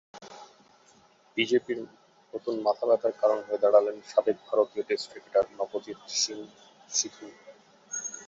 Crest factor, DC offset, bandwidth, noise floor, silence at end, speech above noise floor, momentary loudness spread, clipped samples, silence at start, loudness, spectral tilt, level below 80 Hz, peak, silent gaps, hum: 22 dB; under 0.1%; 8 kHz; -60 dBFS; 0 s; 33 dB; 20 LU; under 0.1%; 0.15 s; -28 LUFS; -2 dB/octave; -76 dBFS; -8 dBFS; none; none